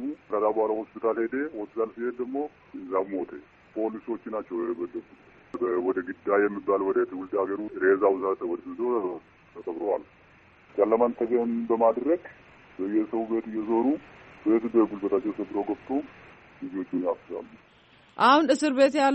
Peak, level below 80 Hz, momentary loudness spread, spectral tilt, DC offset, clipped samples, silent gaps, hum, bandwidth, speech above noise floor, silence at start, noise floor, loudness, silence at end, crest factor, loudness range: -8 dBFS; -68 dBFS; 14 LU; -3.5 dB/octave; under 0.1%; under 0.1%; none; none; 8 kHz; 31 dB; 0 s; -57 dBFS; -27 LUFS; 0 s; 18 dB; 6 LU